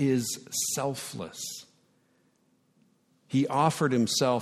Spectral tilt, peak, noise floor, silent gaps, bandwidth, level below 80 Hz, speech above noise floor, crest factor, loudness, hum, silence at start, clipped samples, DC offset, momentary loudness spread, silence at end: -4.5 dB/octave; -10 dBFS; -69 dBFS; none; 16 kHz; -72 dBFS; 41 dB; 20 dB; -28 LUFS; none; 0 s; under 0.1%; under 0.1%; 13 LU; 0 s